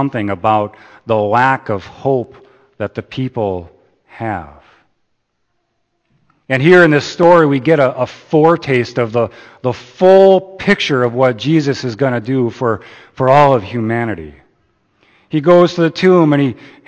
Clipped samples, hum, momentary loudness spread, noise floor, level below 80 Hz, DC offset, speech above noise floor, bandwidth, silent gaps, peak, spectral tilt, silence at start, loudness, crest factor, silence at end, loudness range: 0.1%; none; 14 LU; -66 dBFS; -52 dBFS; under 0.1%; 53 dB; 8.6 kHz; none; 0 dBFS; -7 dB/octave; 0 s; -13 LUFS; 14 dB; 0.35 s; 13 LU